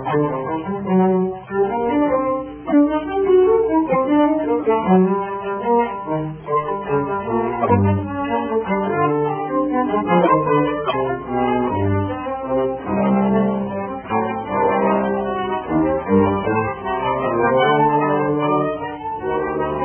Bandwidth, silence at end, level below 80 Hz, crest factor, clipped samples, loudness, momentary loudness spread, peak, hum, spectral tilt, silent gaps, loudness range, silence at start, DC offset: 3.4 kHz; 0 s; -44 dBFS; 16 dB; under 0.1%; -19 LUFS; 8 LU; -4 dBFS; none; -11.5 dB/octave; none; 3 LU; 0 s; under 0.1%